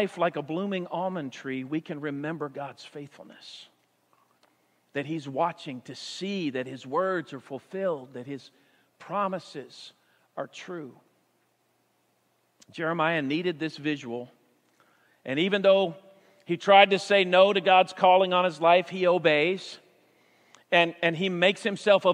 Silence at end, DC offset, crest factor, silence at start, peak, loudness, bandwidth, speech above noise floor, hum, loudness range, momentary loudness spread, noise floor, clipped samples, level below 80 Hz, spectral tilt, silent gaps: 0 s; under 0.1%; 24 dB; 0 s; -2 dBFS; -25 LUFS; 10.5 kHz; 45 dB; none; 16 LU; 22 LU; -71 dBFS; under 0.1%; -84 dBFS; -5 dB/octave; none